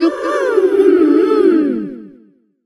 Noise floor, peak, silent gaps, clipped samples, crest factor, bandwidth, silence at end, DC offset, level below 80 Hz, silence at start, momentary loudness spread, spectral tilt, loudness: -49 dBFS; 0 dBFS; none; under 0.1%; 14 dB; 10.5 kHz; 0.55 s; under 0.1%; -58 dBFS; 0 s; 9 LU; -6 dB/octave; -13 LUFS